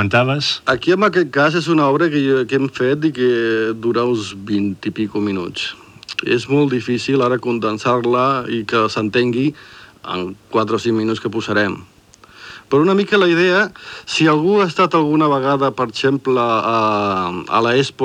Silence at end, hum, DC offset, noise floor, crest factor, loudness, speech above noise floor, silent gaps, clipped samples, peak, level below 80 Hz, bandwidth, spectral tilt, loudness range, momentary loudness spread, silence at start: 0 s; none; under 0.1%; -45 dBFS; 14 dB; -17 LUFS; 29 dB; none; under 0.1%; -2 dBFS; -58 dBFS; 10.5 kHz; -6 dB/octave; 5 LU; 8 LU; 0 s